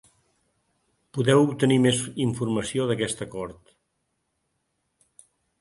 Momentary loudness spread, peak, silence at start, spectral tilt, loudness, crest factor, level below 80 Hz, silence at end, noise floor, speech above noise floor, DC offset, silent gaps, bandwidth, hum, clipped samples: 15 LU; -6 dBFS; 1.15 s; -5.5 dB/octave; -24 LUFS; 22 dB; -60 dBFS; 2.1 s; -76 dBFS; 53 dB; under 0.1%; none; 11.5 kHz; none; under 0.1%